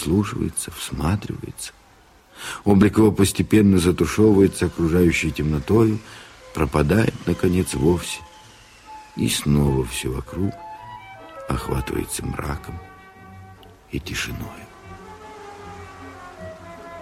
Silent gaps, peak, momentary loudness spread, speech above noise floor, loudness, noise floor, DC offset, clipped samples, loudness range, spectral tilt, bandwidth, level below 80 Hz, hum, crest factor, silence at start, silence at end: none; -4 dBFS; 22 LU; 32 dB; -21 LUFS; -52 dBFS; under 0.1%; under 0.1%; 16 LU; -6 dB/octave; 16 kHz; -38 dBFS; none; 18 dB; 0 s; 0 s